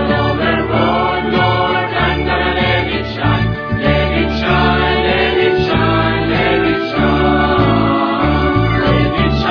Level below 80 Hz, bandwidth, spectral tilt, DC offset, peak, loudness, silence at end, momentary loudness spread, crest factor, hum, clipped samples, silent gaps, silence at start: -26 dBFS; 5.4 kHz; -8 dB/octave; under 0.1%; 0 dBFS; -14 LUFS; 0 s; 3 LU; 14 dB; none; under 0.1%; none; 0 s